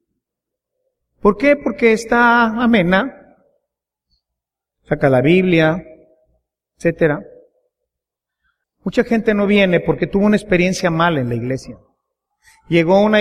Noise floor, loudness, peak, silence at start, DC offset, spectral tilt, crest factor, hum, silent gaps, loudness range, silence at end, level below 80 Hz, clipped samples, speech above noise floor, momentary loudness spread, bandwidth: -83 dBFS; -15 LUFS; -2 dBFS; 1.25 s; under 0.1%; -6.5 dB/octave; 16 dB; none; none; 5 LU; 0 s; -44 dBFS; under 0.1%; 69 dB; 9 LU; 12.5 kHz